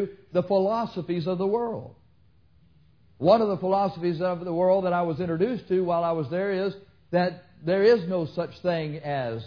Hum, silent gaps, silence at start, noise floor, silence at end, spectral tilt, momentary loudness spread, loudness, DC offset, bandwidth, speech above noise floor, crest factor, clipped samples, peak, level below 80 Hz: none; none; 0 s; -61 dBFS; 0 s; -8.5 dB/octave; 9 LU; -26 LUFS; under 0.1%; 5.4 kHz; 36 dB; 18 dB; under 0.1%; -8 dBFS; -62 dBFS